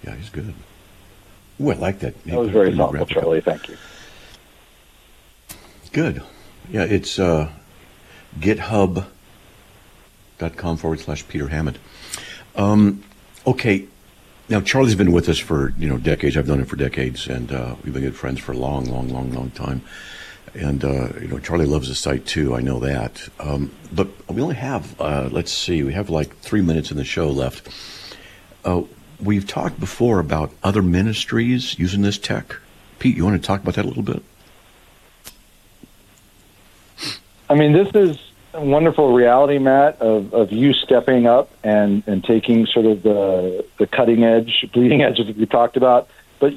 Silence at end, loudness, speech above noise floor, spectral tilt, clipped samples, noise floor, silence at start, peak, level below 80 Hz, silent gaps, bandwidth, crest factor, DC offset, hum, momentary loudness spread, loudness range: 0 s; -19 LUFS; 32 dB; -6 dB/octave; under 0.1%; -50 dBFS; 0.05 s; -4 dBFS; -38 dBFS; none; 14.5 kHz; 16 dB; under 0.1%; none; 16 LU; 10 LU